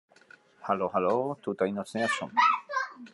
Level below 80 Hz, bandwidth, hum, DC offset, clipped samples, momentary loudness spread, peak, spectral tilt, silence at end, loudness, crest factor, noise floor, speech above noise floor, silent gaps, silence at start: -80 dBFS; 11.5 kHz; none; under 0.1%; under 0.1%; 9 LU; -12 dBFS; -4.5 dB/octave; 0.05 s; -28 LUFS; 18 dB; -57 dBFS; 30 dB; none; 0.6 s